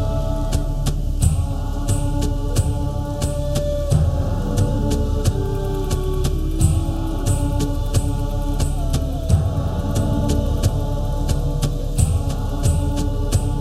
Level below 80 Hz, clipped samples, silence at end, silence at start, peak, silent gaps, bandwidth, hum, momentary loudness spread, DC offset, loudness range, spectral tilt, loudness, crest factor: -22 dBFS; under 0.1%; 0 s; 0 s; -2 dBFS; none; 15 kHz; none; 4 LU; under 0.1%; 1 LU; -6.5 dB/octave; -22 LUFS; 16 dB